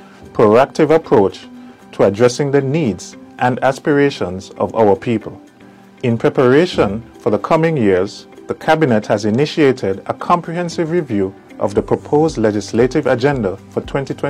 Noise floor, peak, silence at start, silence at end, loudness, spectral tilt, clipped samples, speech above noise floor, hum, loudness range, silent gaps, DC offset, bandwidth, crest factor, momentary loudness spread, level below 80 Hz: -42 dBFS; -2 dBFS; 0.2 s; 0 s; -16 LUFS; -6.5 dB/octave; under 0.1%; 27 dB; none; 2 LU; none; under 0.1%; 12 kHz; 14 dB; 11 LU; -44 dBFS